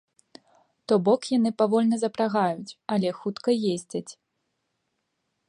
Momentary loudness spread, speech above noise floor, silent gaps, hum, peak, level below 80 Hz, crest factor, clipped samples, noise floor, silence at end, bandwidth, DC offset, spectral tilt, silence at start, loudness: 13 LU; 53 dB; none; none; -8 dBFS; -76 dBFS; 18 dB; under 0.1%; -78 dBFS; 1.35 s; 11 kHz; under 0.1%; -6 dB/octave; 0.9 s; -25 LUFS